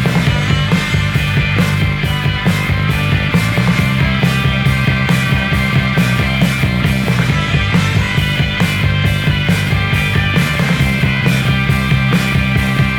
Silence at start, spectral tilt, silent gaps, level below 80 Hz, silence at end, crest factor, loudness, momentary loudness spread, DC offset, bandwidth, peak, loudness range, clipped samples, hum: 0 s; -5.5 dB/octave; none; -26 dBFS; 0 s; 12 dB; -14 LUFS; 1 LU; under 0.1%; 18.5 kHz; 0 dBFS; 1 LU; under 0.1%; none